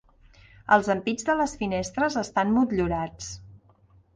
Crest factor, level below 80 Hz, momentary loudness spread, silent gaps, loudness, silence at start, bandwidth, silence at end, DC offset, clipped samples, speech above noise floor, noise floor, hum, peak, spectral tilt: 20 dB; -48 dBFS; 17 LU; none; -25 LUFS; 0.7 s; 10 kHz; 0.6 s; under 0.1%; under 0.1%; 34 dB; -58 dBFS; none; -6 dBFS; -5 dB/octave